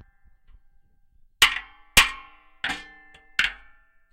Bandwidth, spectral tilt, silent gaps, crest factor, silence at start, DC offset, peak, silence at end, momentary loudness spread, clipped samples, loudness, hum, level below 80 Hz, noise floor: 16 kHz; 0.5 dB/octave; none; 24 dB; 1.4 s; under 0.1%; -4 dBFS; 0.6 s; 15 LU; under 0.1%; -22 LUFS; none; -44 dBFS; -58 dBFS